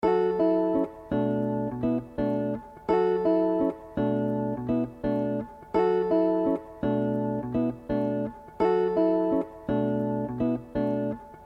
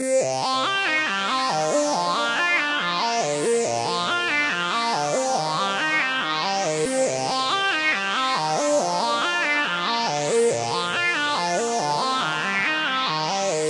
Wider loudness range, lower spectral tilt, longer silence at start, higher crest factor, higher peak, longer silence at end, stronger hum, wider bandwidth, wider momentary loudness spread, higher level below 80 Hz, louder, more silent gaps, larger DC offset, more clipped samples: about the same, 0 LU vs 1 LU; first, -9.5 dB/octave vs -2 dB/octave; about the same, 0 s vs 0 s; about the same, 16 dB vs 14 dB; about the same, -10 dBFS vs -8 dBFS; about the same, 0 s vs 0 s; neither; second, 5.6 kHz vs 11.5 kHz; first, 6 LU vs 2 LU; first, -52 dBFS vs -72 dBFS; second, -27 LUFS vs -22 LUFS; neither; neither; neither